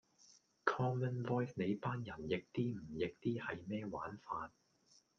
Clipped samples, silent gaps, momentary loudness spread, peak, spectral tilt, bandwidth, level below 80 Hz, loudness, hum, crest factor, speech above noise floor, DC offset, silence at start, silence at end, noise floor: under 0.1%; none; 8 LU; -14 dBFS; -7.5 dB/octave; 7 kHz; -72 dBFS; -41 LUFS; none; 28 dB; 32 dB; under 0.1%; 0.3 s; 0.7 s; -72 dBFS